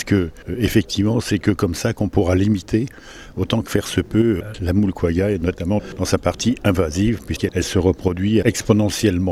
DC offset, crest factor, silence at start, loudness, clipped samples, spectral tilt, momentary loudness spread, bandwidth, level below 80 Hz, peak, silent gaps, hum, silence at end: under 0.1%; 18 dB; 0 s; -20 LUFS; under 0.1%; -6 dB/octave; 5 LU; 15.5 kHz; -38 dBFS; -2 dBFS; none; none; 0 s